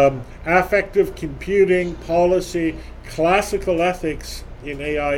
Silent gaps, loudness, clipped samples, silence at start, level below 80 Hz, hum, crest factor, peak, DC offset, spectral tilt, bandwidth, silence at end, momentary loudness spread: none; -20 LUFS; under 0.1%; 0 s; -36 dBFS; none; 18 dB; -2 dBFS; under 0.1%; -5.5 dB/octave; 17 kHz; 0 s; 14 LU